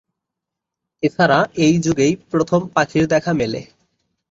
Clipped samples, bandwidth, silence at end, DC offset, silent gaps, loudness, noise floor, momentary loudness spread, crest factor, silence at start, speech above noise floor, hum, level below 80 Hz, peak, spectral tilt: under 0.1%; 7.8 kHz; 0.65 s; under 0.1%; none; -17 LUFS; -83 dBFS; 8 LU; 18 dB; 1 s; 66 dB; none; -50 dBFS; -2 dBFS; -5.5 dB/octave